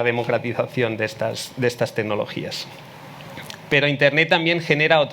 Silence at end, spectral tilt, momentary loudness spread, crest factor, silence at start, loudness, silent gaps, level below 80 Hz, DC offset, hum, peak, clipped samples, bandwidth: 0 s; -5 dB/octave; 20 LU; 20 dB; 0 s; -20 LUFS; none; -60 dBFS; under 0.1%; none; 0 dBFS; under 0.1%; 19.5 kHz